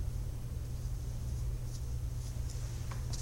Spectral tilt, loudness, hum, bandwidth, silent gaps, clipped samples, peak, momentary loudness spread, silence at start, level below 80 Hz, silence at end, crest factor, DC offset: -5.5 dB/octave; -41 LUFS; none; 16 kHz; none; under 0.1%; -26 dBFS; 2 LU; 0 s; -40 dBFS; 0 s; 12 dB; under 0.1%